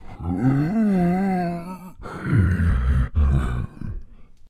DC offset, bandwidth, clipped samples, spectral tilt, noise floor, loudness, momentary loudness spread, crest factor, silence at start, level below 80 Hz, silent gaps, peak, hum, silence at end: under 0.1%; 11 kHz; under 0.1%; -9 dB/octave; -41 dBFS; -22 LUFS; 16 LU; 14 dB; 0 s; -28 dBFS; none; -6 dBFS; none; 0.05 s